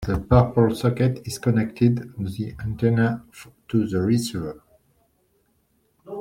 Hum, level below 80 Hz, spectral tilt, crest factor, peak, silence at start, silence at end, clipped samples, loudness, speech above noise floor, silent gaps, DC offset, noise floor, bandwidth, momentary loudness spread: none; -42 dBFS; -7.5 dB/octave; 20 dB; -2 dBFS; 0 s; 0 s; under 0.1%; -22 LUFS; 45 dB; none; under 0.1%; -66 dBFS; 15 kHz; 12 LU